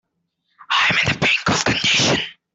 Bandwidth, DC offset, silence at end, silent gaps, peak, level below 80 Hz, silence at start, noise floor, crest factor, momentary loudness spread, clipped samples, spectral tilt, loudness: 8.4 kHz; under 0.1%; 0.2 s; none; 0 dBFS; -50 dBFS; 0.7 s; -72 dBFS; 20 dB; 4 LU; under 0.1%; -2.5 dB/octave; -16 LUFS